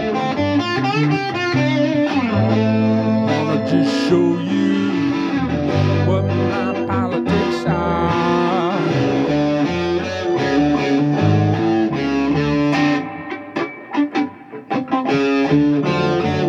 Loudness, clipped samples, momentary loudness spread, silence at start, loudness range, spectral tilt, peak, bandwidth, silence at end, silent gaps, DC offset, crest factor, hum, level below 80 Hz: -18 LUFS; under 0.1%; 5 LU; 0 s; 2 LU; -7 dB/octave; -4 dBFS; 8 kHz; 0 s; none; under 0.1%; 14 dB; none; -46 dBFS